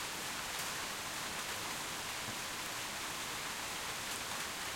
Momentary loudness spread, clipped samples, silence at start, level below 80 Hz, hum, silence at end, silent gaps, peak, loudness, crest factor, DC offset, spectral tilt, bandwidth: 1 LU; under 0.1%; 0 s; -64 dBFS; none; 0 s; none; -24 dBFS; -39 LUFS; 18 dB; under 0.1%; -1 dB/octave; 16.5 kHz